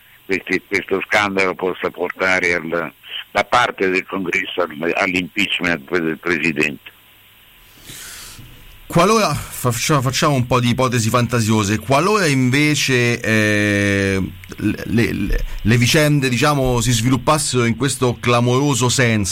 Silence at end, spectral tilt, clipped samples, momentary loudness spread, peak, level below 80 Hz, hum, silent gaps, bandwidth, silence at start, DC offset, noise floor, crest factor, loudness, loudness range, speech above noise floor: 0 s; -4.5 dB/octave; under 0.1%; 8 LU; -6 dBFS; -36 dBFS; none; none; 16.5 kHz; 0.3 s; under 0.1%; -48 dBFS; 12 dB; -17 LUFS; 5 LU; 31 dB